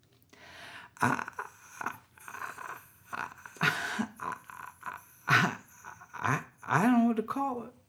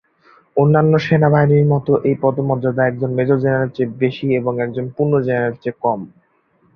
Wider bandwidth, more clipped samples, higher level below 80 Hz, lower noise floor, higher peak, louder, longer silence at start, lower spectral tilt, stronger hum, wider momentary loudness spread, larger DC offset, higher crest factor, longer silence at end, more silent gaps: first, 17 kHz vs 6.2 kHz; neither; second, -72 dBFS vs -52 dBFS; about the same, -57 dBFS vs -59 dBFS; second, -10 dBFS vs -2 dBFS; second, -31 LUFS vs -17 LUFS; second, 0.4 s vs 0.55 s; second, -5 dB/octave vs -9.5 dB/octave; neither; first, 21 LU vs 8 LU; neither; first, 24 dB vs 14 dB; second, 0.2 s vs 0.7 s; neither